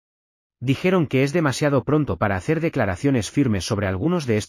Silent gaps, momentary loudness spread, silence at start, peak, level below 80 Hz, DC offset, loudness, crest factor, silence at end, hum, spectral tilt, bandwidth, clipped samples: none; 3 LU; 0.6 s; -6 dBFS; -48 dBFS; under 0.1%; -21 LUFS; 14 dB; 0 s; none; -6.5 dB/octave; 15 kHz; under 0.1%